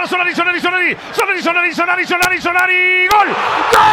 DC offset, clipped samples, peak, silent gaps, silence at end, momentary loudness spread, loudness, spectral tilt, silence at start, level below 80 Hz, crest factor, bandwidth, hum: under 0.1%; under 0.1%; 0 dBFS; none; 0 s; 5 LU; -12 LUFS; -2.5 dB/octave; 0 s; -48 dBFS; 14 dB; 16.5 kHz; none